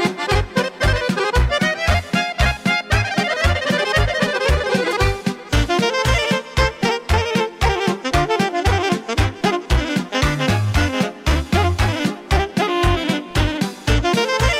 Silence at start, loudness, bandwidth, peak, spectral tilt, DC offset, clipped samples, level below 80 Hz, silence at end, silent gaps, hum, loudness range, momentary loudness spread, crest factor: 0 s; -19 LUFS; 15.5 kHz; -6 dBFS; -5 dB/octave; under 0.1%; under 0.1%; -26 dBFS; 0 s; none; none; 1 LU; 4 LU; 14 dB